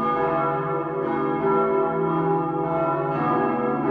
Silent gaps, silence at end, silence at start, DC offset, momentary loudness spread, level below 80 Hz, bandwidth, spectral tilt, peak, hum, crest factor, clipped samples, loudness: none; 0 s; 0 s; under 0.1%; 4 LU; -56 dBFS; 4.7 kHz; -10.5 dB/octave; -10 dBFS; none; 12 dB; under 0.1%; -23 LUFS